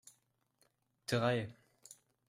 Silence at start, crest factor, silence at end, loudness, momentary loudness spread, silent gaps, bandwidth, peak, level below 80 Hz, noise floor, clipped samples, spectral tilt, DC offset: 1.1 s; 22 dB; 0.35 s; -36 LUFS; 24 LU; none; 15.5 kHz; -20 dBFS; -76 dBFS; -77 dBFS; under 0.1%; -5.5 dB/octave; under 0.1%